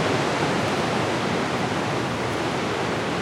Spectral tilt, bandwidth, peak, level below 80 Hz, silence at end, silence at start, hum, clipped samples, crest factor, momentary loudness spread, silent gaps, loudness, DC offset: -5 dB/octave; 16.5 kHz; -10 dBFS; -52 dBFS; 0 s; 0 s; none; under 0.1%; 14 dB; 3 LU; none; -24 LUFS; under 0.1%